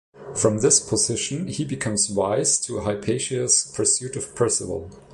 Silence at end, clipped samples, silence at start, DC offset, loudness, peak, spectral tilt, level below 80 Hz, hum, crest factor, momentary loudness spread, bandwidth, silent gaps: 0 s; under 0.1%; 0.15 s; under 0.1%; -21 LUFS; -4 dBFS; -3 dB/octave; -50 dBFS; none; 20 dB; 10 LU; 11.5 kHz; none